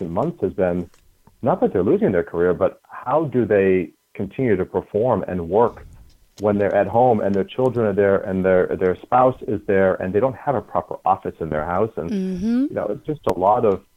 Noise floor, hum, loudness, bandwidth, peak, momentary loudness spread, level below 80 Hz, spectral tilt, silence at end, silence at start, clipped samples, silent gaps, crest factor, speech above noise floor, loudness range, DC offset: -47 dBFS; none; -20 LUFS; 12 kHz; -4 dBFS; 8 LU; -50 dBFS; -9 dB/octave; 0.15 s; 0 s; under 0.1%; none; 16 dB; 27 dB; 3 LU; under 0.1%